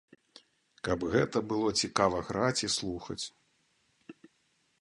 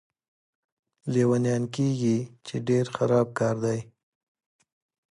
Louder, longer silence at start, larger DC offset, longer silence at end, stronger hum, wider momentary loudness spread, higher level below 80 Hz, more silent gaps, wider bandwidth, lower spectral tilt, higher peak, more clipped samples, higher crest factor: second, -31 LUFS vs -26 LUFS; second, 0.85 s vs 1.05 s; neither; second, 0.7 s vs 1.3 s; neither; about the same, 11 LU vs 10 LU; first, -58 dBFS vs -66 dBFS; neither; about the same, 11.5 kHz vs 11 kHz; second, -4 dB/octave vs -7 dB/octave; about the same, -10 dBFS vs -10 dBFS; neither; first, 24 dB vs 18 dB